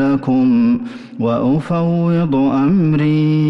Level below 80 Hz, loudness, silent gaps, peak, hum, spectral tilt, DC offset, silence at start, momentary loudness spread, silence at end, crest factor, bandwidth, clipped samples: -46 dBFS; -15 LUFS; none; -6 dBFS; none; -10 dB/octave; under 0.1%; 0 s; 6 LU; 0 s; 8 dB; 6 kHz; under 0.1%